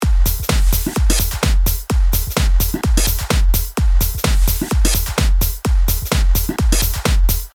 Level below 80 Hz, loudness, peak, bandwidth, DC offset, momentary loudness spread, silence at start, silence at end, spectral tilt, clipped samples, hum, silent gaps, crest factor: -16 dBFS; -17 LUFS; 0 dBFS; over 20 kHz; under 0.1%; 1 LU; 0 s; 0.05 s; -4 dB/octave; under 0.1%; none; none; 14 dB